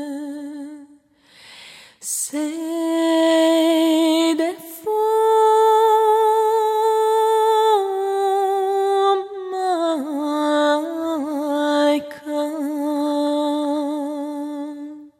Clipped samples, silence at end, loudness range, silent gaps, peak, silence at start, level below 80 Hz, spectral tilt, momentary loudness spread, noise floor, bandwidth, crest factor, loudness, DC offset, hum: under 0.1%; 0.1 s; 5 LU; none; -8 dBFS; 0 s; -74 dBFS; -2 dB/octave; 14 LU; -52 dBFS; 16 kHz; 12 dB; -19 LUFS; under 0.1%; none